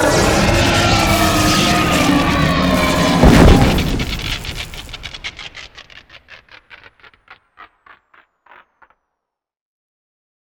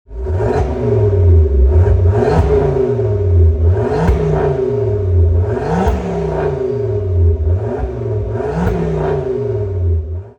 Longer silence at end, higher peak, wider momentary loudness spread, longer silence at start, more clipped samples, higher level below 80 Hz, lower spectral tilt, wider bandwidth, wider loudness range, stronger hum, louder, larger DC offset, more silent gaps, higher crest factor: first, 2.9 s vs 0.1 s; about the same, 0 dBFS vs -2 dBFS; first, 19 LU vs 7 LU; about the same, 0 s vs 0.1 s; neither; about the same, -24 dBFS vs -20 dBFS; second, -4.5 dB/octave vs -9.5 dB/octave; first, over 20 kHz vs 6.8 kHz; first, 21 LU vs 4 LU; neither; about the same, -13 LUFS vs -15 LUFS; neither; neither; about the same, 16 dB vs 12 dB